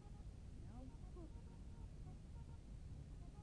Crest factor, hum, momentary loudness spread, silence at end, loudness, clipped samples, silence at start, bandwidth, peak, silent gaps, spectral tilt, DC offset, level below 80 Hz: 12 dB; none; 1 LU; 0 s; -58 LUFS; under 0.1%; 0 s; 10 kHz; -42 dBFS; none; -7.5 dB/octave; under 0.1%; -56 dBFS